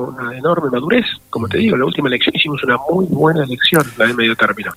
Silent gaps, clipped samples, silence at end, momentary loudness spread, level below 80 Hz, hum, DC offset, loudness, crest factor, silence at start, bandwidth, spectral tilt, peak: none; under 0.1%; 0 s; 6 LU; -50 dBFS; none; under 0.1%; -15 LUFS; 16 dB; 0 s; 16 kHz; -5 dB/octave; 0 dBFS